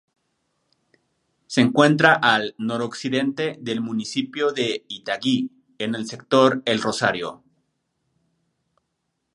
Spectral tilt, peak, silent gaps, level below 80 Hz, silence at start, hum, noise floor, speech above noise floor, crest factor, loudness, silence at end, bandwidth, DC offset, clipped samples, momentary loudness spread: -4.5 dB/octave; 0 dBFS; none; -68 dBFS; 1.5 s; none; -76 dBFS; 55 dB; 22 dB; -21 LUFS; 2 s; 11.5 kHz; under 0.1%; under 0.1%; 13 LU